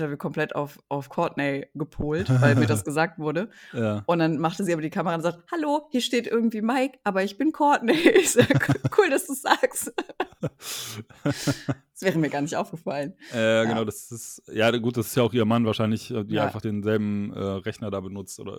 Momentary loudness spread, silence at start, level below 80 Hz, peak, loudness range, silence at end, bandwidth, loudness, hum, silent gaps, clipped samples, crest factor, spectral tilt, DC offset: 12 LU; 0 s; -56 dBFS; -2 dBFS; 6 LU; 0 s; 19.5 kHz; -25 LUFS; none; none; under 0.1%; 22 dB; -5 dB/octave; under 0.1%